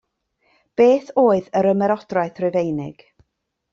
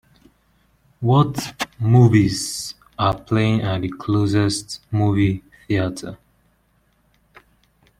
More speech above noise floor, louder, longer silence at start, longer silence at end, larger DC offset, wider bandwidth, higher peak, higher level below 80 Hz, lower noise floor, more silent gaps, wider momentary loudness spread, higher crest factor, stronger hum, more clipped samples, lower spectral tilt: first, 57 dB vs 44 dB; about the same, -19 LUFS vs -20 LUFS; second, 0.8 s vs 1 s; second, 0.8 s vs 1.85 s; neither; second, 7.4 kHz vs 15 kHz; about the same, -4 dBFS vs -2 dBFS; second, -62 dBFS vs -48 dBFS; first, -75 dBFS vs -62 dBFS; neither; about the same, 11 LU vs 13 LU; about the same, 16 dB vs 18 dB; neither; neither; first, -7.5 dB/octave vs -6 dB/octave